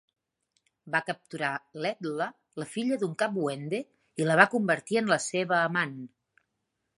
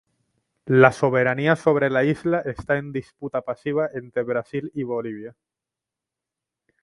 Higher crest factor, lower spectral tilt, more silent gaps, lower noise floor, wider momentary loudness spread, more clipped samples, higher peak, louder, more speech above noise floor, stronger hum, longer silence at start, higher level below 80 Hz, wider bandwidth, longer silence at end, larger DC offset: about the same, 26 dB vs 24 dB; second, -4.5 dB/octave vs -7.5 dB/octave; neither; second, -81 dBFS vs -87 dBFS; about the same, 14 LU vs 15 LU; neither; second, -4 dBFS vs 0 dBFS; second, -28 LUFS vs -22 LUFS; second, 53 dB vs 65 dB; neither; first, 0.85 s vs 0.65 s; second, -80 dBFS vs -56 dBFS; about the same, 11.5 kHz vs 11.5 kHz; second, 0.9 s vs 1.55 s; neither